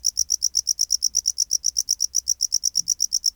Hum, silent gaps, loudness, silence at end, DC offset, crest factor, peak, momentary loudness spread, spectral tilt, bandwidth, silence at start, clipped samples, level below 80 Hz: none; none; -20 LUFS; 0.05 s; under 0.1%; 16 dB; -8 dBFS; 2 LU; 4 dB/octave; over 20 kHz; 0.05 s; under 0.1%; -58 dBFS